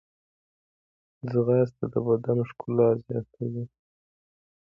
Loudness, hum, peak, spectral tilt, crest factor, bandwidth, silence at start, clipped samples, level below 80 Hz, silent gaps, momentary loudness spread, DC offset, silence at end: -26 LUFS; none; -10 dBFS; -11.5 dB/octave; 18 dB; 5.6 kHz; 1.25 s; under 0.1%; -66 dBFS; none; 12 LU; under 0.1%; 1 s